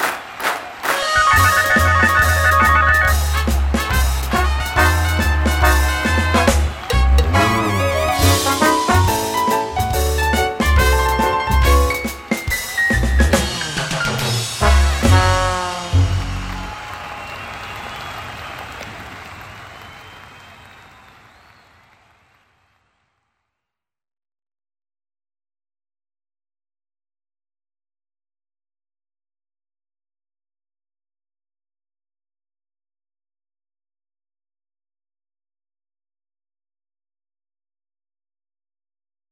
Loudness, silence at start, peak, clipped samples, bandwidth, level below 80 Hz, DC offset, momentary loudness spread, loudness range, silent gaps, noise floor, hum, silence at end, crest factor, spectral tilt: -16 LUFS; 0 s; 0 dBFS; under 0.1%; 16.5 kHz; -24 dBFS; under 0.1%; 17 LU; 17 LU; none; -84 dBFS; none; 18.75 s; 18 dB; -4.5 dB/octave